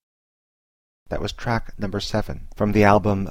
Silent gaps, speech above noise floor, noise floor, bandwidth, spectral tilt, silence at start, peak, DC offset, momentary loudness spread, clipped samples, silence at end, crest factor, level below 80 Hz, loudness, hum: 0.03-1.06 s; over 69 dB; under -90 dBFS; 16 kHz; -6.5 dB/octave; 0 s; 0 dBFS; 0.8%; 13 LU; under 0.1%; 0 s; 22 dB; -36 dBFS; -22 LUFS; none